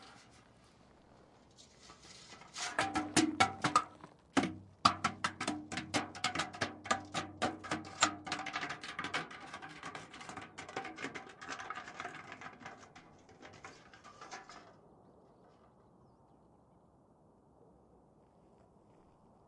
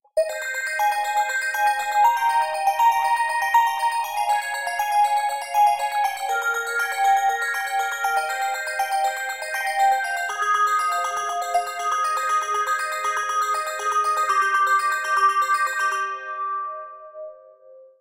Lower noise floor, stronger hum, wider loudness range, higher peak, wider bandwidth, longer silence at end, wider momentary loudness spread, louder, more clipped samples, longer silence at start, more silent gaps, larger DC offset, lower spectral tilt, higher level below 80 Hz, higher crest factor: first, -66 dBFS vs -48 dBFS; neither; first, 21 LU vs 3 LU; about the same, -10 dBFS vs -8 dBFS; second, 11.5 kHz vs 17 kHz; first, 1.85 s vs 0.15 s; first, 24 LU vs 7 LU; second, -37 LUFS vs -22 LUFS; neither; second, 0 s vs 0.15 s; neither; second, under 0.1% vs 0.1%; first, -3 dB/octave vs 2 dB/octave; about the same, -72 dBFS vs -72 dBFS; first, 32 dB vs 14 dB